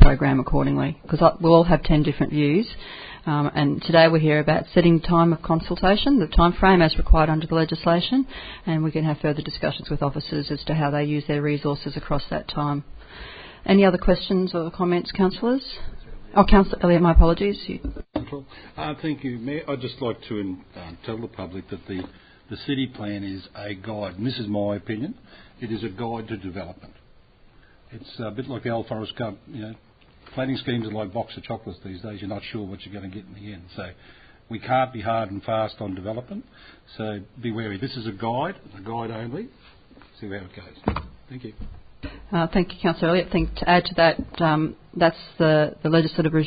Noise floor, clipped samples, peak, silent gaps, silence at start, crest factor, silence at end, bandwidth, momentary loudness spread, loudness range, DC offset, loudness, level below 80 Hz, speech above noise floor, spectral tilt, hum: -52 dBFS; under 0.1%; 0 dBFS; none; 0 s; 22 dB; 0 s; 5 kHz; 20 LU; 14 LU; under 0.1%; -23 LUFS; -32 dBFS; 30 dB; -10.5 dB/octave; none